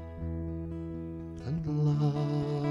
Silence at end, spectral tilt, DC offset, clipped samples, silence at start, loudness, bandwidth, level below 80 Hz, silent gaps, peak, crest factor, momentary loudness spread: 0 s; -9.5 dB/octave; under 0.1%; under 0.1%; 0 s; -33 LUFS; 6.8 kHz; -48 dBFS; none; -18 dBFS; 14 dB; 12 LU